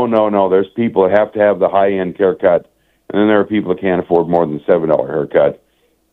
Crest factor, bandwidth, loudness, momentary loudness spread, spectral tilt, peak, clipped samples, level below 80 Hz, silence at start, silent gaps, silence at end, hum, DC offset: 14 dB; 4.3 kHz; -14 LUFS; 4 LU; -9.5 dB/octave; 0 dBFS; under 0.1%; -54 dBFS; 0 s; none; 0.6 s; none; under 0.1%